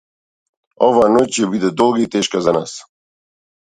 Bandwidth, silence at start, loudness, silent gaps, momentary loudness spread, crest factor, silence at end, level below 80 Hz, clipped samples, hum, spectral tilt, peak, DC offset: 11 kHz; 0.8 s; -15 LUFS; none; 8 LU; 18 dB; 0.85 s; -54 dBFS; under 0.1%; none; -4.5 dB/octave; 0 dBFS; under 0.1%